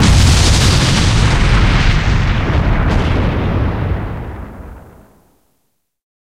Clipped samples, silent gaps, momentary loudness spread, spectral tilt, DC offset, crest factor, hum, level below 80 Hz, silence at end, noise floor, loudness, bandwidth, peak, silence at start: under 0.1%; none; 16 LU; -5 dB/octave; under 0.1%; 14 dB; none; -18 dBFS; 1.55 s; -66 dBFS; -13 LUFS; 14.5 kHz; 0 dBFS; 0 s